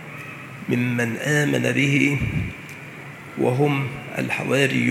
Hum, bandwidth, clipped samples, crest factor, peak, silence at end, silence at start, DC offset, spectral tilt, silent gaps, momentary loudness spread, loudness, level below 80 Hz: none; 16 kHz; under 0.1%; 20 dB; -4 dBFS; 0 s; 0 s; under 0.1%; -5.5 dB/octave; none; 17 LU; -21 LUFS; -48 dBFS